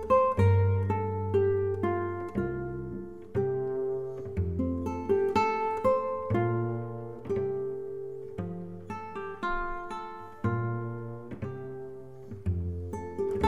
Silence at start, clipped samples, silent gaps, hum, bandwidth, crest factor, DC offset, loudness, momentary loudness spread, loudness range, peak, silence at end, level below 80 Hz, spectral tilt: 0 s; under 0.1%; none; none; 7.4 kHz; 18 dB; 0.3%; -31 LUFS; 14 LU; 6 LU; -12 dBFS; 0 s; -50 dBFS; -9 dB/octave